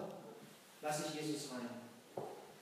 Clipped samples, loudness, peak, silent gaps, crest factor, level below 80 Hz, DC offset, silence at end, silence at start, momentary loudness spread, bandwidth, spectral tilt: under 0.1%; -45 LUFS; -28 dBFS; none; 18 dB; under -90 dBFS; under 0.1%; 0 s; 0 s; 14 LU; 15.5 kHz; -4 dB/octave